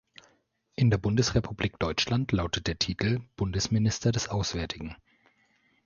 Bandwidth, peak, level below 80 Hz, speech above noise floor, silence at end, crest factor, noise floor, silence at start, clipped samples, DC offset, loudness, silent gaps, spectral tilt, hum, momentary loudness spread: 7.4 kHz; -10 dBFS; -44 dBFS; 41 dB; 0.9 s; 18 dB; -69 dBFS; 0.8 s; under 0.1%; under 0.1%; -28 LUFS; none; -5 dB/octave; none; 8 LU